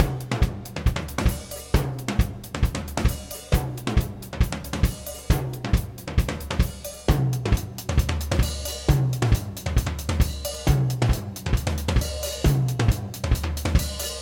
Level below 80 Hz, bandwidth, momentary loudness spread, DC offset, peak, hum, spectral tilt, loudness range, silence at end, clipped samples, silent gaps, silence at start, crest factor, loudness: -28 dBFS; 17.5 kHz; 5 LU; under 0.1%; -4 dBFS; none; -5.5 dB/octave; 2 LU; 0 s; under 0.1%; none; 0 s; 20 dB; -26 LUFS